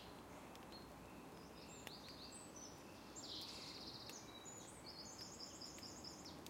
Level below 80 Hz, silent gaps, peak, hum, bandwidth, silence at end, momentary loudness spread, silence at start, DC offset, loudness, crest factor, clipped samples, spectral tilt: -72 dBFS; none; -32 dBFS; none; 16.5 kHz; 0 s; 7 LU; 0 s; under 0.1%; -54 LUFS; 24 dB; under 0.1%; -2.5 dB/octave